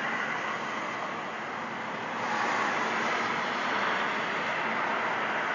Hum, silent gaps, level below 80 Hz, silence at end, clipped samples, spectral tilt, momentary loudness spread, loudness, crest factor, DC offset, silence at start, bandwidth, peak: none; none; -74 dBFS; 0 s; under 0.1%; -3 dB/octave; 7 LU; -30 LUFS; 14 dB; under 0.1%; 0 s; 7.6 kHz; -16 dBFS